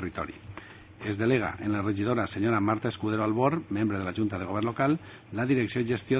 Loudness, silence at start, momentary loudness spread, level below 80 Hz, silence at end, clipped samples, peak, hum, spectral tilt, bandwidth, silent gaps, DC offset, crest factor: -29 LUFS; 0 s; 12 LU; -52 dBFS; 0 s; under 0.1%; -10 dBFS; none; -6.5 dB/octave; 4 kHz; none; under 0.1%; 18 dB